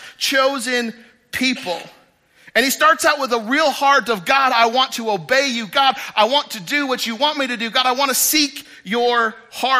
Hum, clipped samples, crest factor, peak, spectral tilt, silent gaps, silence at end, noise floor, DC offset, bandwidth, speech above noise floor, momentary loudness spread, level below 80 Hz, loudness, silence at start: none; under 0.1%; 16 dB; -2 dBFS; -1.5 dB/octave; none; 0 s; -50 dBFS; under 0.1%; 15.5 kHz; 32 dB; 8 LU; -64 dBFS; -17 LUFS; 0 s